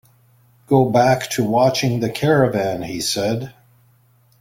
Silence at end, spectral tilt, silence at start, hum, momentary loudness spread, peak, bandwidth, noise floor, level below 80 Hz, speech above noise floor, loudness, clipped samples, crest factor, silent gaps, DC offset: 0.9 s; -5.5 dB/octave; 0.7 s; none; 8 LU; -2 dBFS; 16.5 kHz; -56 dBFS; -52 dBFS; 38 dB; -18 LUFS; under 0.1%; 18 dB; none; under 0.1%